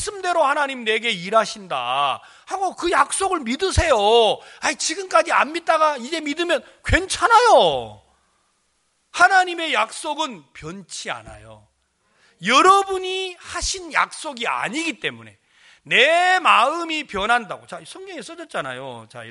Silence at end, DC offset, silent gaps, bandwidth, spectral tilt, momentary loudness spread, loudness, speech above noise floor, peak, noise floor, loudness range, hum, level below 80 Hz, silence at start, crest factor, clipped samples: 0 s; under 0.1%; none; 11.5 kHz; -2.5 dB/octave; 18 LU; -19 LUFS; 47 dB; 0 dBFS; -67 dBFS; 4 LU; none; -40 dBFS; 0 s; 20 dB; under 0.1%